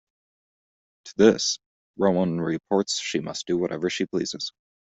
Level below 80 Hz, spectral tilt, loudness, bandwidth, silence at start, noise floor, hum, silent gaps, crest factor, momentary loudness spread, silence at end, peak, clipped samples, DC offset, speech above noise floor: -64 dBFS; -4.5 dB/octave; -25 LUFS; 8.2 kHz; 1.05 s; under -90 dBFS; none; 1.66-1.94 s; 22 dB; 12 LU; 0.45 s; -4 dBFS; under 0.1%; under 0.1%; over 66 dB